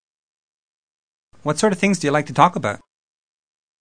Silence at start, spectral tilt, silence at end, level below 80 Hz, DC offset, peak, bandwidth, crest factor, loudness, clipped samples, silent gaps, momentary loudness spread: 1.45 s; -5 dB/octave; 1.05 s; -60 dBFS; under 0.1%; 0 dBFS; 10.5 kHz; 22 dB; -19 LUFS; under 0.1%; none; 11 LU